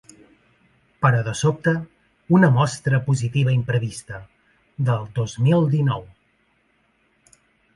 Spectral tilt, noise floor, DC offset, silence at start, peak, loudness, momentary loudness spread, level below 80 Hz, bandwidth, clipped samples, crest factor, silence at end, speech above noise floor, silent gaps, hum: -7 dB/octave; -64 dBFS; under 0.1%; 1 s; -2 dBFS; -21 LUFS; 14 LU; -54 dBFS; 11.5 kHz; under 0.1%; 20 dB; 1.7 s; 45 dB; none; none